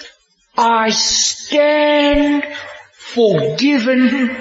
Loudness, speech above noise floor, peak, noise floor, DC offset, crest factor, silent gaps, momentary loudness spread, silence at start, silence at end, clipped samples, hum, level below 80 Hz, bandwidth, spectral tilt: -14 LUFS; 35 dB; -2 dBFS; -49 dBFS; under 0.1%; 12 dB; none; 13 LU; 0 s; 0 s; under 0.1%; none; -40 dBFS; 8 kHz; -3 dB/octave